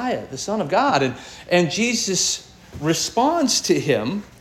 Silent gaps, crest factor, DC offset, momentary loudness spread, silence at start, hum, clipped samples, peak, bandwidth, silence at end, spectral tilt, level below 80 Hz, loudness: none; 18 dB; under 0.1%; 9 LU; 0 s; none; under 0.1%; -4 dBFS; 17 kHz; 0.15 s; -3.5 dB/octave; -54 dBFS; -20 LUFS